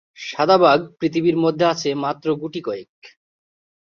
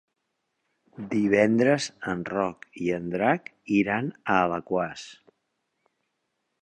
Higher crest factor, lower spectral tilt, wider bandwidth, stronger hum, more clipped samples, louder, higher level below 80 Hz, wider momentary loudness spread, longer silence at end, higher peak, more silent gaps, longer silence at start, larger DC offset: about the same, 18 dB vs 22 dB; about the same, -5.5 dB/octave vs -6 dB/octave; second, 7.2 kHz vs 10 kHz; neither; neither; first, -19 LUFS vs -26 LUFS; about the same, -64 dBFS vs -62 dBFS; first, 14 LU vs 11 LU; second, 0.8 s vs 1.5 s; first, -2 dBFS vs -6 dBFS; first, 2.89-3.02 s vs none; second, 0.2 s vs 1 s; neither